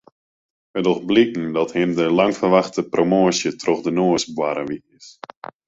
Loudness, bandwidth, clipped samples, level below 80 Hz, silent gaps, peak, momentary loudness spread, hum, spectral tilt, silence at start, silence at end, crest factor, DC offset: -19 LUFS; 8 kHz; under 0.1%; -60 dBFS; none; -2 dBFS; 14 LU; none; -5 dB/octave; 0.75 s; 0.55 s; 18 dB; under 0.1%